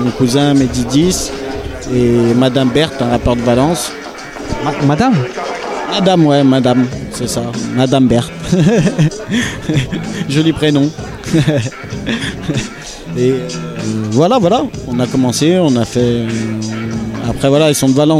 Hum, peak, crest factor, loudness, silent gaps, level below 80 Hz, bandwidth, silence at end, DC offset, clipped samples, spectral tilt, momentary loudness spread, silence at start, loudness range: none; 0 dBFS; 12 dB; -14 LUFS; none; -34 dBFS; 15.5 kHz; 0 s; under 0.1%; under 0.1%; -5.5 dB/octave; 10 LU; 0 s; 3 LU